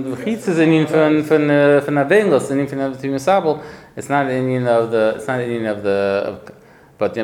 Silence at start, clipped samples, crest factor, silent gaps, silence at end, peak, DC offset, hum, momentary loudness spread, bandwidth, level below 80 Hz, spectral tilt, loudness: 0 s; under 0.1%; 16 dB; none; 0 s; -2 dBFS; under 0.1%; none; 9 LU; 15.5 kHz; -58 dBFS; -6.5 dB/octave; -17 LUFS